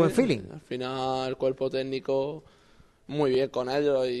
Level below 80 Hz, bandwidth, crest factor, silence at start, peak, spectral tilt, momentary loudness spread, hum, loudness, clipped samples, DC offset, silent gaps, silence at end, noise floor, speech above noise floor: -60 dBFS; 12 kHz; 18 dB; 0 s; -8 dBFS; -6.5 dB/octave; 9 LU; none; -28 LUFS; under 0.1%; under 0.1%; none; 0 s; -58 dBFS; 31 dB